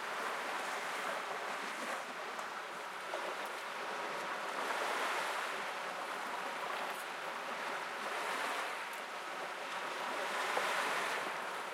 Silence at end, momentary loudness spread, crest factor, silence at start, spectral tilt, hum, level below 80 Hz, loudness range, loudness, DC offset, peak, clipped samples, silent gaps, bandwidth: 0 s; 6 LU; 20 dB; 0 s; -1 dB/octave; none; under -90 dBFS; 3 LU; -39 LUFS; under 0.1%; -20 dBFS; under 0.1%; none; 16.5 kHz